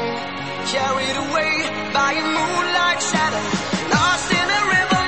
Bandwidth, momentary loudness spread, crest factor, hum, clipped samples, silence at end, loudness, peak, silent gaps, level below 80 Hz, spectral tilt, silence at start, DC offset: 8.8 kHz; 6 LU; 16 dB; none; under 0.1%; 0 s; -19 LUFS; -4 dBFS; none; -48 dBFS; -3 dB/octave; 0 s; 0.6%